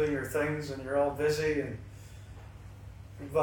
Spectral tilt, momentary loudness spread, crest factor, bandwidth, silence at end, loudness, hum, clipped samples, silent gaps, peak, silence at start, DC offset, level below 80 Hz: -6 dB/octave; 20 LU; 16 dB; 18 kHz; 0 s; -31 LUFS; none; under 0.1%; none; -16 dBFS; 0 s; under 0.1%; -52 dBFS